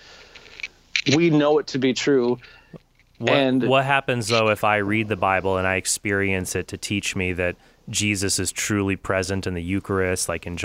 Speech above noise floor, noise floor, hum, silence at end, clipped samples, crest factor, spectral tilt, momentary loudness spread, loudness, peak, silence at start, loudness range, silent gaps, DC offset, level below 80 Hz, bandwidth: 24 dB; -46 dBFS; none; 0 s; under 0.1%; 20 dB; -4 dB/octave; 9 LU; -22 LUFS; -2 dBFS; 0.1 s; 3 LU; none; under 0.1%; -50 dBFS; 16 kHz